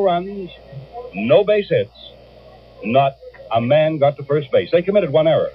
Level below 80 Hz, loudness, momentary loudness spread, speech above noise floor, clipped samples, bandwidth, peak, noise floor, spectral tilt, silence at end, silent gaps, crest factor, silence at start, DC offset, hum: -52 dBFS; -17 LUFS; 17 LU; 26 dB; under 0.1%; 5.4 kHz; -2 dBFS; -44 dBFS; -9.5 dB/octave; 0 s; none; 16 dB; 0 s; under 0.1%; none